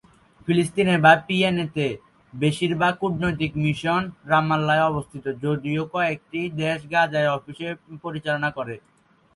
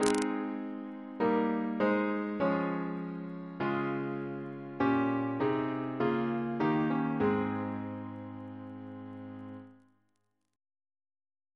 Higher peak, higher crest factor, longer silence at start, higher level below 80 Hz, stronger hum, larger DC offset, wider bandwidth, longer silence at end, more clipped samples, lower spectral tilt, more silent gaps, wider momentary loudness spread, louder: first, -2 dBFS vs -8 dBFS; about the same, 22 dB vs 26 dB; first, 0.45 s vs 0 s; first, -54 dBFS vs -70 dBFS; neither; neither; about the same, 11.5 kHz vs 11 kHz; second, 0.55 s vs 1.8 s; neither; about the same, -6 dB/octave vs -6.5 dB/octave; neither; about the same, 14 LU vs 15 LU; first, -23 LUFS vs -33 LUFS